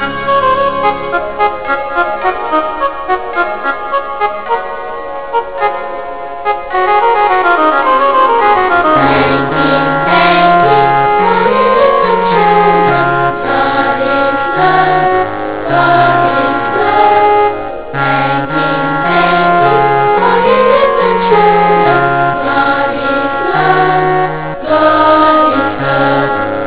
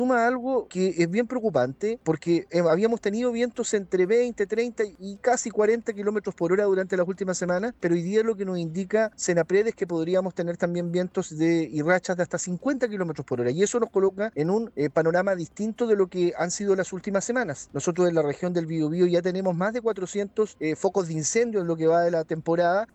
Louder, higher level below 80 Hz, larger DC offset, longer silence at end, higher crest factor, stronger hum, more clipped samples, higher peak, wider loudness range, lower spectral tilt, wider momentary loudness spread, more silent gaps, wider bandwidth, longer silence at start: first, -10 LUFS vs -25 LUFS; first, -40 dBFS vs -64 dBFS; first, 3% vs under 0.1%; about the same, 0 s vs 0.1 s; second, 10 dB vs 16 dB; neither; first, 0.2% vs under 0.1%; first, 0 dBFS vs -8 dBFS; first, 6 LU vs 1 LU; first, -9 dB/octave vs -5.5 dB/octave; first, 9 LU vs 5 LU; neither; second, 4 kHz vs 8.8 kHz; about the same, 0 s vs 0 s